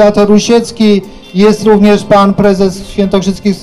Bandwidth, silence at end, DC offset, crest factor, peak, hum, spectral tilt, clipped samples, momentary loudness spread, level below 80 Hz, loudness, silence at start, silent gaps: 12 kHz; 0 s; under 0.1%; 8 dB; 0 dBFS; none; -6 dB/octave; under 0.1%; 7 LU; -32 dBFS; -8 LUFS; 0 s; none